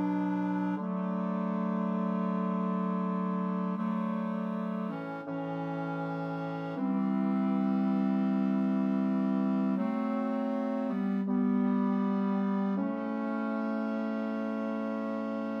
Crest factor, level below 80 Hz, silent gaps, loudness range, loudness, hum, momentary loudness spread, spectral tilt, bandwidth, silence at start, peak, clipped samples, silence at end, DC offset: 12 dB; -88 dBFS; none; 4 LU; -31 LUFS; none; 6 LU; -10 dB/octave; 5.6 kHz; 0 s; -20 dBFS; under 0.1%; 0 s; under 0.1%